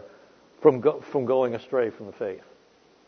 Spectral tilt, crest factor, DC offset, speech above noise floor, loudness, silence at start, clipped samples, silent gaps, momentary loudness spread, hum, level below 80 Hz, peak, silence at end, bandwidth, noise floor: -8.5 dB/octave; 22 dB; under 0.1%; 34 dB; -25 LUFS; 0 s; under 0.1%; none; 14 LU; none; -74 dBFS; -4 dBFS; 0.7 s; 6.4 kHz; -59 dBFS